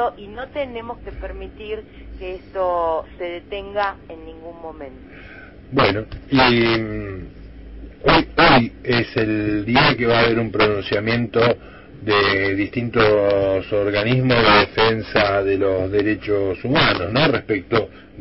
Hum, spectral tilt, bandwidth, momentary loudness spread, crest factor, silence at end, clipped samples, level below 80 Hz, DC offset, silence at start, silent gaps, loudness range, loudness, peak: none; -9.5 dB/octave; 5.8 kHz; 19 LU; 18 dB; 0 s; under 0.1%; -40 dBFS; under 0.1%; 0 s; none; 9 LU; -18 LUFS; -2 dBFS